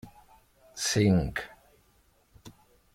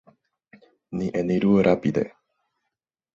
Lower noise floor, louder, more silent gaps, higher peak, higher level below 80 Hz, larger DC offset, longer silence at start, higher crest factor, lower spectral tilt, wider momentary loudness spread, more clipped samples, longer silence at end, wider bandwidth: second, -65 dBFS vs -83 dBFS; second, -27 LUFS vs -23 LUFS; neither; second, -12 dBFS vs -6 dBFS; first, -50 dBFS vs -56 dBFS; neither; second, 0.05 s vs 0.9 s; about the same, 20 dB vs 20 dB; second, -5 dB/octave vs -8.5 dB/octave; first, 22 LU vs 13 LU; neither; second, 0.45 s vs 1.05 s; first, 16 kHz vs 7.4 kHz